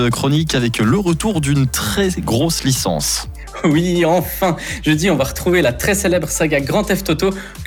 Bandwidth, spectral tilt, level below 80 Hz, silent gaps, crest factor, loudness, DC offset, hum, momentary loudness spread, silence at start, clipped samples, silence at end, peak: over 20 kHz; -4.5 dB/octave; -32 dBFS; none; 12 dB; -16 LUFS; under 0.1%; none; 4 LU; 0 s; under 0.1%; 0 s; -4 dBFS